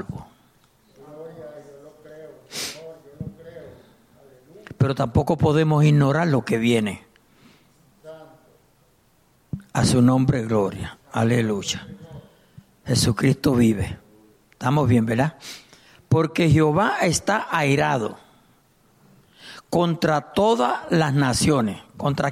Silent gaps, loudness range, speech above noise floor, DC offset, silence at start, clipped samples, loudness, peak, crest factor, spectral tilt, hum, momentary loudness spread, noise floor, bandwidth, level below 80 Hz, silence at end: none; 13 LU; 40 dB; under 0.1%; 0 s; under 0.1%; -21 LUFS; -8 dBFS; 16 dB; -6 dB/octave; none; 23 LU; -60 dBFS; 15 kHz; -48 dBFS; 0 s